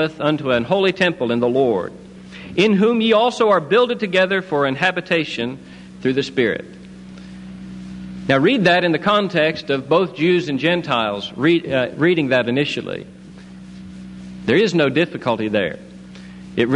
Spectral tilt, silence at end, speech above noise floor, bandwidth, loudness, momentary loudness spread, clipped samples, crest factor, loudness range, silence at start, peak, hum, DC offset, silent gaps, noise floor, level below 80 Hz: -6 dB/octave; 0 s; 21 dB; 10.5 kHz; -18 LUFS; 21 LU; under 0.1%; 16 dB; 4 LU; 0 s; -2 dBFS; none; under 0.1%; none; -38 dBFS; -52 dBFS